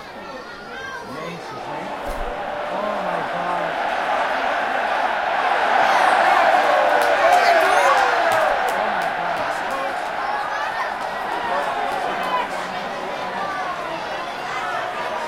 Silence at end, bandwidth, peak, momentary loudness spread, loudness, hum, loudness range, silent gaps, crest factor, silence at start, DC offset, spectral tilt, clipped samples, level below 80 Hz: 0 s; 16.5 kHz; -2 dBFS; 14 LU; -20 LUFS; none; 9 LU; none; 18 dB; 0 s; under 0.1%; -3 dB/octave; under 0.1%; -46 dBFS